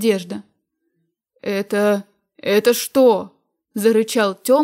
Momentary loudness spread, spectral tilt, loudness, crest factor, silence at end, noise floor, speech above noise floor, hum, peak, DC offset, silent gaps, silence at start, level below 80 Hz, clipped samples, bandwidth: 17 LU; -4.5 dB/octave; -18 LUFS; 16 dB; 0 s; -71 dBFS; 54 dB; none; -4 dBFS; under 0.1%; none; 0 s; -72 dBFS; under 0.1%; 16 kHz